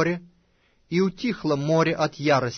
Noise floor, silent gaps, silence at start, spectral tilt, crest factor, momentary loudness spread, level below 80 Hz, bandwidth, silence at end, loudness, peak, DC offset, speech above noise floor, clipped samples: -64 dBFS; none; 0 s; -6 dB/octave; 16 dB; 6 LU; -58 dBFS; 6.6 kHz; 0 s; -24 LUFS; -8 dBFS; under 0.1%; 41 dB; under 0.1%